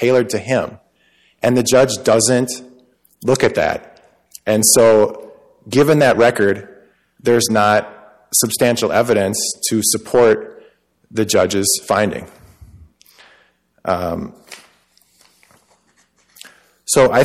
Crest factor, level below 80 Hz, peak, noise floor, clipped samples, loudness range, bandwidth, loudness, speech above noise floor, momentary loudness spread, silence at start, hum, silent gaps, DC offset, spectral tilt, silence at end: 16 dB; -52 dBFS; 0 dBFS; -58 dBFS; under 0.1%; 14 LU; 16 kHz; -15 LUFS; 44 dB; 15 LU; 0 s; none; none; under 0.1%; -3.5 dB/octave; 0 s